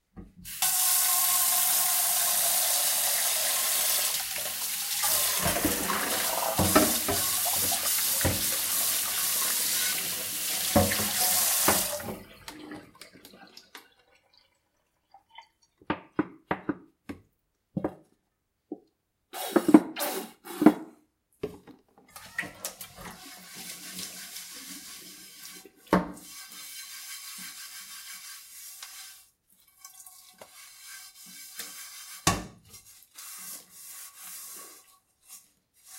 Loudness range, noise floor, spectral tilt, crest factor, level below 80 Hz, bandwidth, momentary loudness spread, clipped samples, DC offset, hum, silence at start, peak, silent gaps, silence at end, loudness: 18 LU; -78 dBFS; -2 dB/octave; 28 dB; -56 dBFS; 16 kHz; 23 LU; under 0.1%; under 0.1%; none; 0.15 s; -2 dBFS; none; 0 s; -25 LUFS